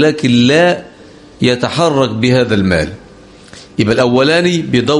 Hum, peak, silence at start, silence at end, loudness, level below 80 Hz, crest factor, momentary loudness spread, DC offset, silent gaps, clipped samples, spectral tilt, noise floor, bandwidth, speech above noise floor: none; 0 dBFS; 0 s; 0 s; -12 LUFS; -40 dBFS; 12 dB; 7 LU; under 0.1%; none; under 0.1%; -5.5 dB/octave; -38 dBFS; 11.5 kHz; 27 dB